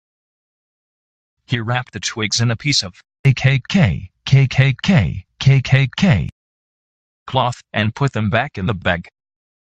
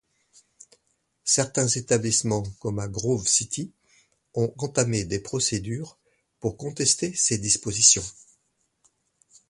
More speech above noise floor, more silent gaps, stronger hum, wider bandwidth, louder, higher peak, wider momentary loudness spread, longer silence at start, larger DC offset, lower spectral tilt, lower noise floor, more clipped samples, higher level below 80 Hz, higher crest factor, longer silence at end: first, over 74 dB vs 47 dB; first, 3.19-3.24 s, 6.32-7.26 s vs none; neither; second, 8.8 kHz vs 11.5 kHz; first, -17 LUFS vs -23 LUFS; about the same, -2 dBFS vs -2 dBFS; second, 9 LU vs 14 LU; first, 1.5 s vs 1.25 s; neither; first, -5.5 dB/octave vs -3 dB/octave; first, under -90 dBFS vs -72 dBFS; neither; first, -42 dBFS vs -54 dBFS; second, 18 dB vs 24 dB; second, 0.6 s vs 1.4 s